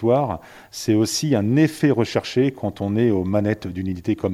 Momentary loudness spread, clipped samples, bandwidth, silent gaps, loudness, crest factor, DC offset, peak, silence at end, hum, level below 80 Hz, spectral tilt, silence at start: 9 LU; under 0.1%; 15.5 kHz; none; -21 LUFS; 14 dB; under 0.1%; -6 dBFS; 0 s; none; -52 dBFS; -6 dB/octave; 0 s